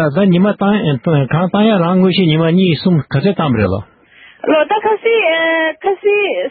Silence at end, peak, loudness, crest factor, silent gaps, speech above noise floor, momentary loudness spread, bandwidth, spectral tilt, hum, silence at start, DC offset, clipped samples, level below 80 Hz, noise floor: 0 s; -2 dBFS; -13 LUFS; 12 dB; none; 31 dB; 4 LU; 4.8 kHz; -12.5 dB/octave; none; 0 s; under 0.1%; under 0.1%; -50 dBFS; -43 dBFS